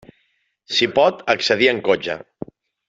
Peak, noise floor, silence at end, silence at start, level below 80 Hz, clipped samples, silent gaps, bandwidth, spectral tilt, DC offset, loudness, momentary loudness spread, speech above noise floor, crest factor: -2 dBFS; -66 dBFS; 0.7 s; 0.7 s; -60 dBFS; under 0.1%; none; 7.8 kHz; -3.5 dB/octave; under 0.1%; -18 LUFS; 21 LU; 48 dB; 18 dB